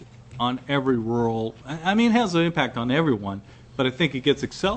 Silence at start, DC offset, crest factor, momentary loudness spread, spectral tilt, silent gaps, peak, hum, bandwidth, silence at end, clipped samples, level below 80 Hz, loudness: 0 s; under 0.1%; 18 dB; 11 LU; -6 dB/octave; none; -4 dBFS; none; 8.6 kHz; 0 s; under 0.1%; -52 dBFS; -23 LUFS